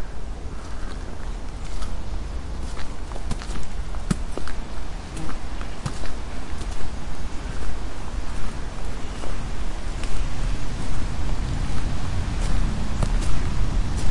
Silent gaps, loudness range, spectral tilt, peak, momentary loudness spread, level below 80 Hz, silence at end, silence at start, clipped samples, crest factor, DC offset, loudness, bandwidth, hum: none; 6 LU; -5.5 dB/octave; -6 dBFS; 8 LU; -28 dBFS; 0 s; 0 s; under 0.1%; 14 dB; under 0.1%; -31 LUFS; 11.5 kHz; none